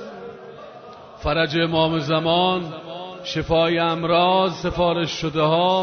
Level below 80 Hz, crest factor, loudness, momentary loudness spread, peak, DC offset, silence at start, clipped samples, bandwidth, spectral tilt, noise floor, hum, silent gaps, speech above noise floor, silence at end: -44 dBFS; 16 dB; -20 LUFS; 21 LU; -6 dBFS; under 0.1%; 0 s; under 0.1%; 6.6 kHz; -6 dB/octave; -41 dBFS; none; none; 21 dB; 0 s